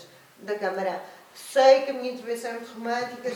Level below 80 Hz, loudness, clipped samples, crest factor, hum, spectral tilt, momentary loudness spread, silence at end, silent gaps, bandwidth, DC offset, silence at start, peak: -82 dBFS; -25 LUFS; under 0.1%; 20 dB; none; -3.5 dB/octave; 20 LU; 0 s; none; 17 kHz; under 0.1%; 0 s; -6 dBFS